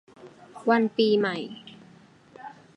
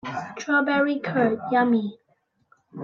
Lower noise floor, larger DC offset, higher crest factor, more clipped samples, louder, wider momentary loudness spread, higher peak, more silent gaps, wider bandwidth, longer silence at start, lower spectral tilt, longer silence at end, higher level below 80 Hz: second, -54 dBFS vs -68 dBFS; neither; about the same, 20 dB vs 16 dB; neither; about the same, -24 LUFS vs -23 LUFS; first, 23 LU vs 12 LU; about the same, -8 dBFS vs -8 dBFS; neither; first, 10.5 kHz vs 7.2 kHz; first, 0.2 s vs 0.05 s; about the same, -6.5 dB/octave vs -6 dB/octave; first, 0.25 s vs 0 s; second, -76 dBFS vs -70 dBFS